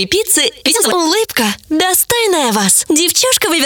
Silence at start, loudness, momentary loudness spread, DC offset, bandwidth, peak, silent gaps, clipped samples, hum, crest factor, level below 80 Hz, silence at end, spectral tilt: 0 s; -11 LUFS; 4 LU; under 0.1%; over 20 kHz; 0 dBFS; none; under 0.1%; none; 14 dB; -48 dBFS; 0 s; -1.5 dB/octave